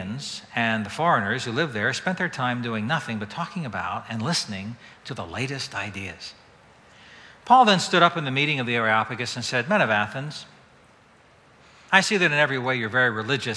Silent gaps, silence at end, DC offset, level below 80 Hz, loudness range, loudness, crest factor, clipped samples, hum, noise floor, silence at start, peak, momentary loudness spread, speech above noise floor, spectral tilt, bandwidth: none; 0 s; under 0.1%; -64 dBFS; 9 LU; -23 LUFS; 24 dB; under 0.1%; none; -55 dBFS; 0 s; 0 dBFS; 15 LU; 31 dB; -4 dB/octave; 11 kHz